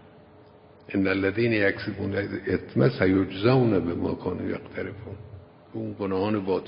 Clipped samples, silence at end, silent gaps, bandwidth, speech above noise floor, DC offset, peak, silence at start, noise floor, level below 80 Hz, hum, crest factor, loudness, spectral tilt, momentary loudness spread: under 0.1%; 0 s; none; 5.4 kHz; 27 dB; under 0.1%; -6 dBFS; 0.9 s; -52 dBFS; -50 dBFS; none; 20 dB; -26 LUFS; -11.5 dB/octave; 14 LU